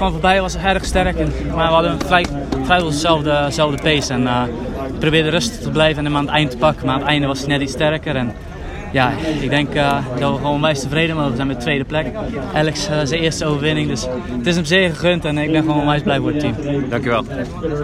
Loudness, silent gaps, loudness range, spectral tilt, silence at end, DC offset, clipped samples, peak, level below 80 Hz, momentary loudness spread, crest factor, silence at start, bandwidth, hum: -17 LUFS; none; 2 LU; -5 dB/octave; 0 s; under 0.1%; under 0.1%; 0 dBFS; -32 dBFS; 6 LU; 18 dB; 0 s; 14 kHz; none